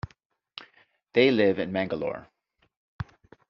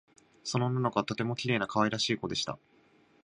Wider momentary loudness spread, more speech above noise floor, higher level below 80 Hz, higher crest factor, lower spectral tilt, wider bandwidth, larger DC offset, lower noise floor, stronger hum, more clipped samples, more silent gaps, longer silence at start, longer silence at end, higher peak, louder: first, 24 LU vs 8 LU; first, 41 dB vs 33 dB; first, -58 dBFS vs -66 dBFS; about the same, 22 dB vs 22 dB; about the same, -4 dB/octave vs -4.5 dB/octave; second, 6.4 kHz vs 10.5 kHz; neither; about the same, -65 dBFS vs -64 dBFS; neither; neither; first, 0.25-0.30 s, 2.77-2.99 s vs none; second, 0.05 s vs 0.45 s; second, 0.45 s vs 0.7 s; first, -6 dBFS vs -12 dBFS; first, -25 LUFS vs -31 LUFS